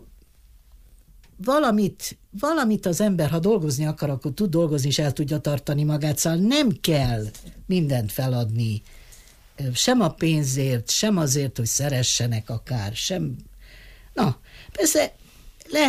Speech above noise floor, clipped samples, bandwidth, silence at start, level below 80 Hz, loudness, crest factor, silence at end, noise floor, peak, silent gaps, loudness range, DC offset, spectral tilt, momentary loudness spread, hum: 30 dB; under 0.1%; 15.5 kHz; 0 s; -48 dBFS; -23 LUFS; 14 dB; 0 s; -52 dBFS; -8 dBFS; none; 3 LU; under 0.1%; -4.5 dB/octave; 9 LU; none